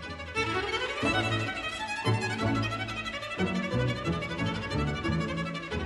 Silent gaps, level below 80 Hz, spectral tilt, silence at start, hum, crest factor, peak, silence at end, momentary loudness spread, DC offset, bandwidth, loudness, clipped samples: none; -46 dBFS; -5.5 dB/octave; 0 s; none; 16 dB; -16 dBFS; 0 s; 5 LU; under 0.1%; 11.5 kHz; -30 LUFS; under 0.1%